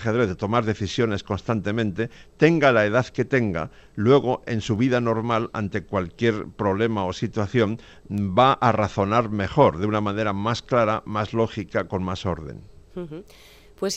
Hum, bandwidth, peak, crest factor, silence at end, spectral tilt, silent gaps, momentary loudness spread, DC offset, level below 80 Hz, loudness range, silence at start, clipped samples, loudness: none; 10.5 kHz; -4 dBFS; 20 dB; 0 s; -6.5 dB/octave; none; 12 LU; under 0.1%; -50 dBFS; 4 LU; 0 s; under 0.1%; -23 LUFS